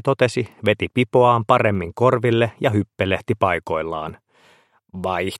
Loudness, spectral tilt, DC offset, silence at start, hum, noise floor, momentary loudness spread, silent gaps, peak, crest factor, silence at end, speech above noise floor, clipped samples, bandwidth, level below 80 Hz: -20 LUFS; -6.5 dB/octave; under 0.1%; 0.05 s; none; -56 dBFS; 11 LU; none; 0 dBFS; 20 dB; 0 s; 37 dB; under 0.1%; 14 kHz; -52 dBFS